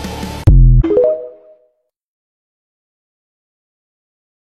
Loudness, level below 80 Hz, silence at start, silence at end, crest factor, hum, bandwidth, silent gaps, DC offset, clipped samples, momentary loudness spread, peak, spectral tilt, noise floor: -13 LUFS; -18 dBFS; 0 s; 3.2 s; 16 dB; none; 8.4 kHz; none; under 0.1%; under 0.1%; 14 LU; 0 dBFS; -8.5 dB/octave; -61 dBFS